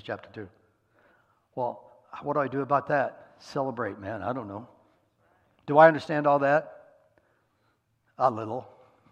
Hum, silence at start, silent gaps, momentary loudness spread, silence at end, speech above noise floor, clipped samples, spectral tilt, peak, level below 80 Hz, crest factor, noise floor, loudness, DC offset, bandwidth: none; 0.05 s; none; 25 LU; 0.45 s; 45 dB; under 0.1%; -7.5 dB/octave; -4 dBFS; -74 dBFS; 26 dB; -71 dBFS; -26 LUFS; under 0.1%; 8.4 kHz